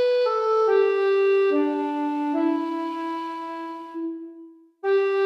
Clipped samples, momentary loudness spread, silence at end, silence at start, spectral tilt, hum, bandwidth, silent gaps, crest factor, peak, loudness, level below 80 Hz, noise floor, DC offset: under 0.1%; 13 LU; 0 s; 0 s; -4 dB/octave; none; 6.2 kHz; none; 14 dB; -10 dBFS; -23 LUFS; -82 dBFS; -47 dBFS; under 0.1%